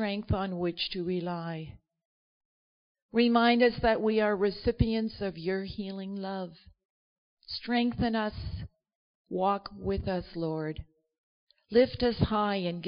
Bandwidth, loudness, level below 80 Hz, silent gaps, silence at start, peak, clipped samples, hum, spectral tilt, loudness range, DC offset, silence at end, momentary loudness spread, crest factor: 5.4 kHz; -30 LUFS; -48 dBFS; 2.05-2.95 s, 3.02-3.09 s, 6.85-7.37 s, 8.95-9.25 s, 11.18-11.47 s; 0 s; -12 dBFS; under 0.1%; none; -4.5 dB/octave; 7 LU; under 0.1%; 0 s; 14 LU; 20 dB